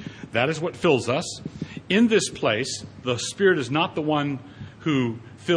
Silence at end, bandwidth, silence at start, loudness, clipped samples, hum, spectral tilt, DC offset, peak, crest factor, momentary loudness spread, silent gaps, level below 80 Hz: 0 s; 10.5 kHz; 0 s; -24 LUFS; under 0.1%; none; -4.5 dB/octave; under 0.1%; -6 dBFS; 18 dB; 13 LU; none; -58 dBFS